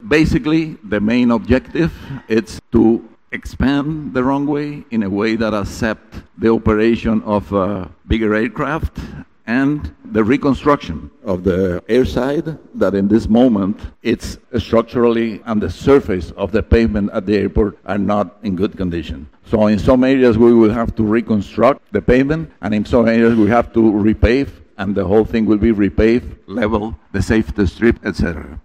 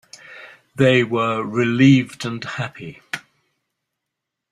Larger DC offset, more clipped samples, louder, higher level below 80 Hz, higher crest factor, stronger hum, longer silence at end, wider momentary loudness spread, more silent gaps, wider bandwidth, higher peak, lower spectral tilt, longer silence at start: first, 0.3% vs under 0.1%; neither; about the same, -16 LUFS vs -18 LUFS; first, -32 dBFS vs -58 dBFS; about the same, 14 dB vs 18 dB; neither; second, 0.05 s vs 1.35 s; second, 10 LU vs 24 LU; neither; second, 10 kHz vs 11.5 kHz; about the same, -2 dBFS vs -2 dBFS; about the same, -7.5 dB/octave vs -6.5 dB/octave; second, 0 s vs 0.3 s